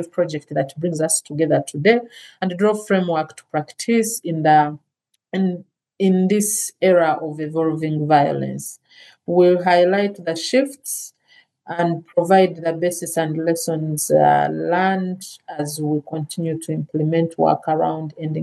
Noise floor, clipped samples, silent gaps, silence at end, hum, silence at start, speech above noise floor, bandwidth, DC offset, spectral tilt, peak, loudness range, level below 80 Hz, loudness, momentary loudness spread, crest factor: -56 dBFS; under 0.1%; none; 0 s; none; 0 s; 37 dB; 13 kHz; under 0.1%; -5 dB/octave; 0 dBFS; 2 LU; -74 dBFS; -19 LUFS; 12 LU; 18 dB